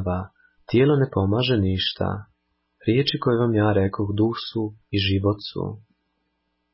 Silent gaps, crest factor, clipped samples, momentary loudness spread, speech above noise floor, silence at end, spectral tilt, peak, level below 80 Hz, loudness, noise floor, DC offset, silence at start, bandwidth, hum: none; 14 dB; under 0.1%; 11 LU; 52 dB; 0.95 s; -11 dB/octave; -8 dBFS; -42 dBFS; -23 LUFS; -73 dBFS; under 0.1%; 0 s; 5.8 kHz; none